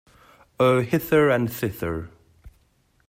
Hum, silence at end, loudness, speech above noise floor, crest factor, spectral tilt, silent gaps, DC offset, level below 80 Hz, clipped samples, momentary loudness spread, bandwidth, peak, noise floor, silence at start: none; 0.6 s; -22 LUFS; 42 dB; 18 dB; -6.5 dB/octave; none; under 0.1%; -52 dBFS; under 0.1%; 12 LU; 16 kHz; -6 dBFS; -64 dBFS; 0.6 s